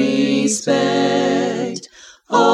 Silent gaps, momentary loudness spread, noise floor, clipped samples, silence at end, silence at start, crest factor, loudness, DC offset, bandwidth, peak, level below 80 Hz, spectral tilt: none; 8 LU; -42 dBFS; under 0.1%; 0 s; 0 s; 16 dB; -17 LUFS; under 0.1%; 12.5 kHz; -2 dBFS; -66 dBFS; -4 dB/octave